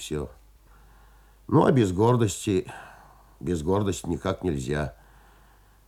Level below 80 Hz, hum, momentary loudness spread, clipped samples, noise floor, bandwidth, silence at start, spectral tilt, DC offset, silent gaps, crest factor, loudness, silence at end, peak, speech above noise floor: -48 dBFS; none; 15 LU; under 0.1%; -56 dBFS; 16 kHz; 0 s; -6.5 dB/octave; under 0.1%; none; 22 dB; -25 LUFS; 0.95 s; -6 dBFS; 32 dB